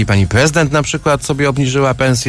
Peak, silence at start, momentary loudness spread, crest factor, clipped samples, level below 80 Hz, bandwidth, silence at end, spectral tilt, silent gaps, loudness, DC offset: -2 dBFS; 0 s; 4 LU; 12 dB; under 0.1%; -34 dBFS; 11 kHz; 0 s; -5 dB/octave; none; -13 LUFS; under 0.1%